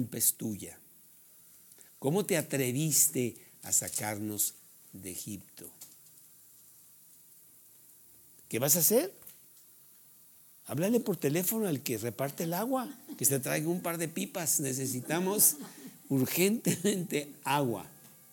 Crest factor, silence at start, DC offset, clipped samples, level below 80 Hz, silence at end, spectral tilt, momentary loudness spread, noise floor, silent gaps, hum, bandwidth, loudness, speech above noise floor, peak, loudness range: 26 dB; 0 s; under 0.1%; under 0.1%; -78 dBFS; 0.25 s; -3.5 dB/octave; 21 LU; -58 dBFS; none; none; over 20 kHz; -30 LUFS; 27 dB; -8 dBFS; 9 LU